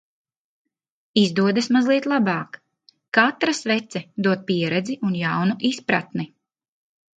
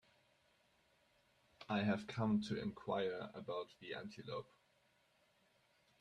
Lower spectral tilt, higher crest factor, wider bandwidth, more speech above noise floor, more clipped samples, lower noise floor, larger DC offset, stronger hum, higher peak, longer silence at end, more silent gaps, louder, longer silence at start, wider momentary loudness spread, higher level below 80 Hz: second, -5.5 dB/octave vs -7 dB/octave; about the same, 20 dB vs 20 dB; about the same, 9.2 kHz vs 9.8 kHz; first, 39 dB vs 35 dB; neither; second, -60 dBFS vs -77 dBFS; neither; neither; first, -2 dBFS vs -24 dBFS; second, 0.95 s vs 1.6 s; first, 3.08-3.12 s vs none; first, -21 LUFS vs -43 LUFS; second, 1.15 s vs 1.6 s; about the same, 9 LU vs 11 LU; first, -68 dBFS vs -76 dBFS